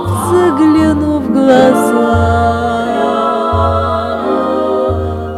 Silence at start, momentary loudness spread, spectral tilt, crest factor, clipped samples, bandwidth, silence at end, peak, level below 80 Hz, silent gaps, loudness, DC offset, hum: 0 s; 6 LU; -7 dB/octave; 12 dB; 0.1%; 14.5 kHz; 0 s; 0 dBFS; -30 dBFS; none; -12 LUFS; under 0.1%; none